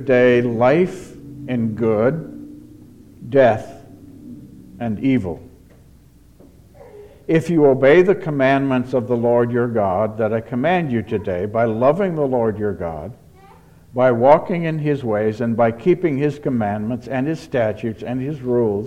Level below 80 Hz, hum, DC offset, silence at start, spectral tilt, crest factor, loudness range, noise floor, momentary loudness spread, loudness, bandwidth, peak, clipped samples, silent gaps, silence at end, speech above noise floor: -50 dBFS; none; under 0.1%; 0 s; -8.5 dB/octave; 18 dB; 5 LU; -48 dBFS; 16 LU; -18 LUFS; 11 kHz; 0 dBFS; under 0.1%; none; 0 s; 31 dB